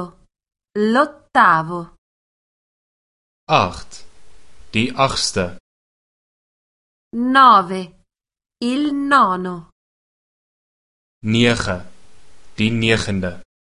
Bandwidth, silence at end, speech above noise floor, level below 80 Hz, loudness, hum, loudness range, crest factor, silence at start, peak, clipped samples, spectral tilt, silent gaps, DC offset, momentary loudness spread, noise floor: 11.5 kHz; 0.3 s; 47 dB; -46 dBFS; -17 LUFS; none; 7 LU; 20 dB; 0 s; 0 dBFS; under 0.1%; -4.5 dB/octave; 1.98-3.47 s, 5.60-7.11 s, 9.72-11.21 s; under 0.1%; 17 LU; -64 dBFS